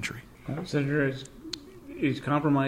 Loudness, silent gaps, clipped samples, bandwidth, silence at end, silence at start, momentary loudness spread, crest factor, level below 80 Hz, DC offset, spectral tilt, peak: -30 LUFS; none; under 0.1%; 15 kHz; 0 s; 0 s; 14 LU; 16 dB; -56 dBFS; under 0.1%; -6.5 dB/octave; -14 dBFS